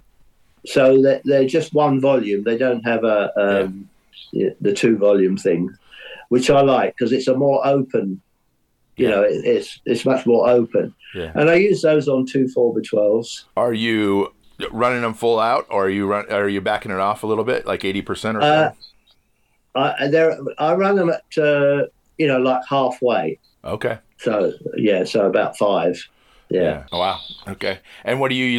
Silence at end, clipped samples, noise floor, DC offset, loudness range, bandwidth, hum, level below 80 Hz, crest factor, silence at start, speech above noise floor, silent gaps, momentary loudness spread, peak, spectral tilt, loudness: 0 s; under 0.1%; -65 dBFS; under 0.1%; 3 LU; 12.5 kHz; none; -54 dBFS; 12 dB; 0.65 s; 47 dB; none; 11 LU; -6 dBFS; -6 dB/octave; -19 LUFS